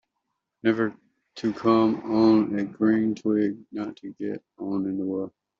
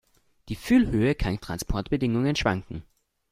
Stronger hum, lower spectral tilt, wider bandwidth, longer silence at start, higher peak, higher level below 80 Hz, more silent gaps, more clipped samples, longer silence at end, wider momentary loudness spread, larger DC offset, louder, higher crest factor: neither; about the same, -6 dB/octave vs -6 dB/octave; second, 7 kHz vs 15.5 kHz; first, 0.65 s vs 0.45 s; about the same, -8 dBFS vs -8 dBFS; second, -66 dBFS vs -38 dBFS; neither; neither; second, 0.3 s vs 0.5 s; about the same, 14 LU vs 16 LU; neither; about the same, -25 LUFS vs -25 LUFS; about the same, 16 dB vs 18 dB